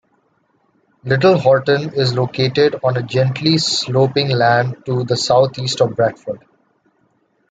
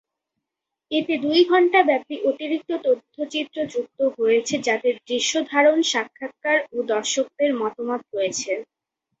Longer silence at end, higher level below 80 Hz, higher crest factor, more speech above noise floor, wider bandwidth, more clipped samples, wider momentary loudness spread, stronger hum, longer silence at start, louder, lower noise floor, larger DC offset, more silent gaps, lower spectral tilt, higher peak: first, 1.15 s vs 0.55 s; first, -56 dBFS vs -70 dBFS; about the same, 16 dB vs 18 dB; second, 46 dB vs 63 dB; first, 9.2 kHz vs 8.2 kHz; neither; second, 7 LU vs 10 LU; neither; first, 1.05 s vs 0.9 s; first, -16 LUFS vs -22 LUFS; second, -61 dBFS vs -84 dBFS; neither; neither; first, -5 dB/octave vs -2 dB/octave; first, 0 dBFS vs -4 dBFS